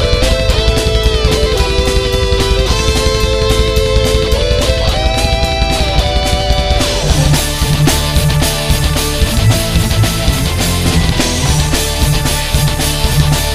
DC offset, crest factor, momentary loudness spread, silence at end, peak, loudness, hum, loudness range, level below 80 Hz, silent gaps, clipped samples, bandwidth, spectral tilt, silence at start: 2%; 12 dB; 2 LU; 0 s; 0 dBFS; -12 LUFS; none; 1 LU; -16 dBFS; none; under 0.1%; 16.5 kHz; -4 dB/octave; 0 s